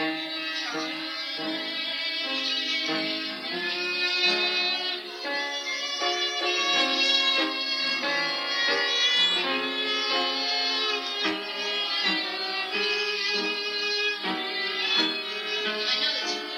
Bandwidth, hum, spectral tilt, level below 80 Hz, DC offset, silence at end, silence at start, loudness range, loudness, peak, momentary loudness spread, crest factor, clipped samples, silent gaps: 16.5 kHz; none; -1 dB/octave; -90 dBFS; under 0.1%; 0 s; 0 s; 3 LU; -25 LUFS; -8 dBFS; 8 LU; 18 dB; under 0.1%; none